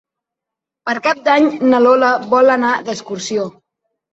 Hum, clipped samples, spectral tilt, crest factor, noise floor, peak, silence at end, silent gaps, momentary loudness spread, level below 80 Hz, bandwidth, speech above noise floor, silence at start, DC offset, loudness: none; under 0.1%; -4 dB/octave; 14 dB; -84 dBFS; 0 dBFS; 0.65 s; none; 12 LU; -62 dBFS; 8 kHz; 70 dB; 0.85 s; under 0.1%; -14 LUFS